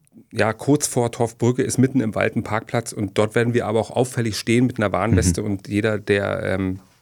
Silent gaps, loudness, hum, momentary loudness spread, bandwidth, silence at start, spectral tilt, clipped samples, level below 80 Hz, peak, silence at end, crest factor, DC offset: none; -21 LUFS; none; 6 LU; 18.5 kHz; 0.15 s; -5.5 dB/octave; under 0.1%; -44 dBFS; -2 dBFS; 0.2 s; 18 dB; under 0.1%